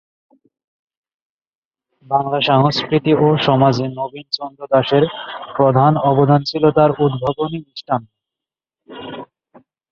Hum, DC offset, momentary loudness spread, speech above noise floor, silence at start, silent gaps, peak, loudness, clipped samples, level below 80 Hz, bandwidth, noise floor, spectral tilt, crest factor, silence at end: none; under 0.1%; 14 LU; 72 dB; 2.1 s; none; -2 dBFS; -16 LUFS; under 0.1%; -54 dBFS; 7 kHz; -87 dBFS; -7.5 dB/octave; 16 dB; 0.65 s